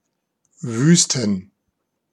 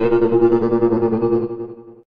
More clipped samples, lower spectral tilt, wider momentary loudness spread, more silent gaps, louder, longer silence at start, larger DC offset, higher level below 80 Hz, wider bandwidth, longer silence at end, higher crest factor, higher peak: neither; second, -4 dB/octave vs -10.5 dB/octave; about the same, 14 LU vs 14 LU; neither; about the same, -18 LUFS vs -17 LUFS; first, 0.65 s vs 0 s; neither; second, -66 dBFS vs -44 dBFS; first, 11.5 kHz vs 4.9 kHz; first, 0.7 s vs 0.2 s; first, 20 dB vs 14 dB; first, 0 dBFS vs -4 dBFS